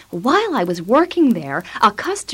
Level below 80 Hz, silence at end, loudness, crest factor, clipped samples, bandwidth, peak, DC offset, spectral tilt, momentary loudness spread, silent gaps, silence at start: -56 dBFS; 0 s; -17 LUFS; 14 dB; under 0.1%; 16.5 kHz; -2 dBFS; under 0.1%; -5 dB/octave; 6 LU; none; 0.1 s